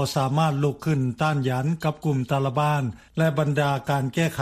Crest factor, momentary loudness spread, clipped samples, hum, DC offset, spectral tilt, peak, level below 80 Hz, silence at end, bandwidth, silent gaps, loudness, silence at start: 16 dB; 4 LU; under 0.1%; none; under 0.1%; -6.5 dB/octave; -8 dBFS; -56 dBFS; 0 s; 15.5 kHz; none; -24 LUFS; 0 s